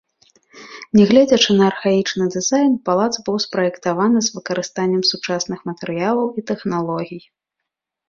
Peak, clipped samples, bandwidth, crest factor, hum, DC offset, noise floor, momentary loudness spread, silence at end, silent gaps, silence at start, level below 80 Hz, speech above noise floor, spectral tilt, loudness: 0 dBFS; under 0.1%; 7.6 kHz; 18 dB; none; under 0.1%; -81 dBFS; 13 LU; 0.9 s; none; 0.55 s; -58 dBFS; 64 dB; -4.5 dB/octave; -18 LUFS